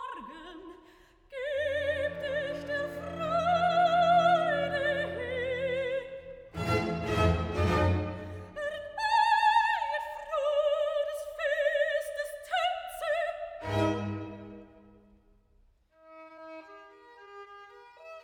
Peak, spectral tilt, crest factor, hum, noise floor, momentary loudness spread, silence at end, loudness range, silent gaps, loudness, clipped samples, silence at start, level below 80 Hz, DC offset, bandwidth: -12 dBFS; -5.5 dB/octave; 18 dB; none; -65 dBFS; 22 LU; 0 s; 8 LU; none; -29 LUFS; under 0.1%; 0 s; -50 dBFS; under 0.1%; 19 kHz